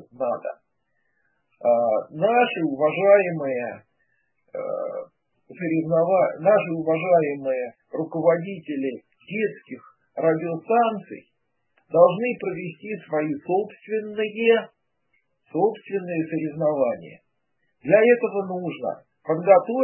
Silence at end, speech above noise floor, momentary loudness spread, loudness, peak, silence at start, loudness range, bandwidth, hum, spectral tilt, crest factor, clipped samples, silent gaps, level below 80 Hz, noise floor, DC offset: 0 s; 53 dB; 17 LU; -23 LUFS; -2 dBFS; 0.2 s; 4 LU; 3.2 kHz; none; -11 dB/octave; 22 dB; under 0.1%; none; -76 dBFS; -75 dBFS; under 0.1%